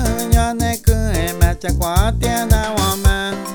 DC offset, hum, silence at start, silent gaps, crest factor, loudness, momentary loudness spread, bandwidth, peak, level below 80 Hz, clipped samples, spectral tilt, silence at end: under 0.1%; none; 0 s; none; 16 dB; -17 LUFS; 3 LU; over 20 kHz; 0 dBFS; -20 dBFS; under 0.1%; -5 dB/octave; 0 s